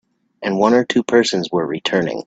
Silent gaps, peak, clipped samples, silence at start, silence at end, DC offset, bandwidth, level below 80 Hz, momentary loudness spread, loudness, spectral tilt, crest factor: none; 0 dBFS; under 0.1%; 0.4 s; 0.05 s; under 0.1%; 9 kHz; -58 dBFS; 7 LU; -17 LUFS; -4.5 dB/octave; 18 dB